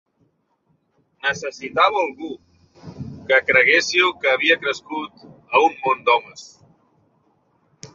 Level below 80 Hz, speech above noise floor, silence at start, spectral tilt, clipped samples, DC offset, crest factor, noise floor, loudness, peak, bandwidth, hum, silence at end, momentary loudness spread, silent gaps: -60 dBFS; 47 dB; 1.25 s; -2.5 dB/octave; under 0.1%; under 0.1%; 20 dB; -66 dBFS; -18 LUFS; -2 dBFS; 7.6 kHz; none; 0.1 s; 22 LU; none